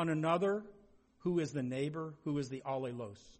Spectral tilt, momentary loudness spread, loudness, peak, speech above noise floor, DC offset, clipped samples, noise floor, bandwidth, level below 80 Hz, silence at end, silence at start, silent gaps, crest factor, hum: -7 dB/octave; 10 LU; -37 LUFS; -20 dBFS; 28 dB; under 0.1%; under 0.1%; -65 dBFS; 8.4 kHz; -72 dBFS; 0.1 s; 0 s; none; 18 dB; none